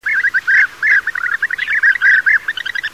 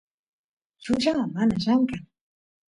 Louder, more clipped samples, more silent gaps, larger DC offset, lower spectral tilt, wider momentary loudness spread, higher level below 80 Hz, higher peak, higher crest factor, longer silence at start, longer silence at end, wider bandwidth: first, -12 LUFS vs -24 LUFS; neither; neither; first, 0.3% vs under 0.1%; second, 0.5 dB/octave vs -6 dB/octave; second, 8 LU vs 12 LU; about the same, -56 dBFS vs -56 dBFS; first, -2 dBFS vs -10 dBFS; about the same, 12 dB vs 16 dB; second, 0.05 s vs 0.8 s; second, 0.05 s vs 0.65 s; first, 16 kHz vs 11 kHz